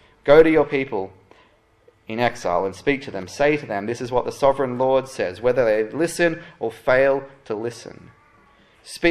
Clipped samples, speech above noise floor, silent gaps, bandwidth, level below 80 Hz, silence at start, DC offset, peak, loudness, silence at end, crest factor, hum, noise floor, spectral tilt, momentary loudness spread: under 0.1%; 37 dB; none; 13 kHz; -48 dBFS; 0.25 s; under 0.1%; -2 dBFS; -21 LUFS; 0 s; 20 dB; none; -57 dBFS; -5.5 dB/octave; 15 LU